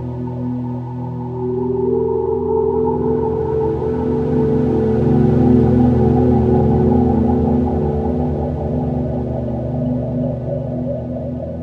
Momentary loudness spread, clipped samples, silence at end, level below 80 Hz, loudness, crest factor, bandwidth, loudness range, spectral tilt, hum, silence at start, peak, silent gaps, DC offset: 10 LU; under 0.1%; 0 s; -30 dBFS; -17 LUFS; 16 dB; 4.7 kHz; 6 LU; -11.5 dB/octave; none; 0 s; 0 dBFS; none; under 0.1%